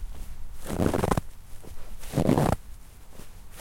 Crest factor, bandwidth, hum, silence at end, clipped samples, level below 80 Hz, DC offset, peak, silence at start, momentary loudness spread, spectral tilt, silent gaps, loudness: 22 dB; 16.5 kHz; none; 0 s; under 0.1%; -38 dBFS; under 0.1%; -8 dBFS; 0 s; 25 LU; -6.5 dB/octave; none; -27 LUFS